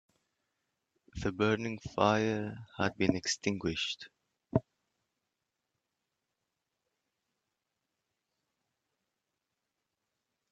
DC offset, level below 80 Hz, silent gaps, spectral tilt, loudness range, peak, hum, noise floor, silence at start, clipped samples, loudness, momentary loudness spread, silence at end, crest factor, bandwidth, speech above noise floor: under 0.1%; -62 dBFS; none; -4.5 dB/octave; 12 LU; -10 dBFS; none; -86 dBFS; 1.15 s; under 0.1%; -33 LUFS; 11 LU; 5.9 s; 28 dB; 9 kHz; 54 dB